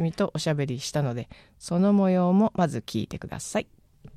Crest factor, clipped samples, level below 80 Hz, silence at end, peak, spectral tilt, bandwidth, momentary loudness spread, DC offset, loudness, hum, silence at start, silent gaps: 16 dB; under 0.1%; -56 dBFS; 0.05 s; -10 dBFS; -6.5 dB/octave; 13.5 kHz; 14 LU; under 0.1%; -26 LUFS; none; 0 s; none